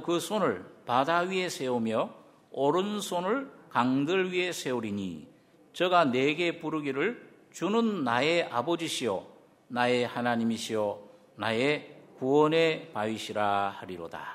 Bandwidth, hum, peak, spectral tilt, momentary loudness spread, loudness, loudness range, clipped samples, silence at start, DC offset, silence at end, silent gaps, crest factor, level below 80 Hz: 16 kHz; none; -8 dBFS; -4.5 dB/octave; 11 LU; -29 LUFS; 2 LU; under 0.1%; 0 s; under 0.1%; 0 s; none; 20 dB; -74 dBFS